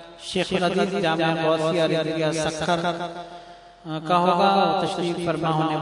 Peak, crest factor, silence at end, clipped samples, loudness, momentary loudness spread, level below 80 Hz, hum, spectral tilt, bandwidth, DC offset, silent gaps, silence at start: -4 dBFS; 18 dB; 0 s; under 0.1%; -22 LUFS; 14 LU; -58 dBFS; none; -5.5 dB/octave; 11 kHz; under 0.1%; none; 0 s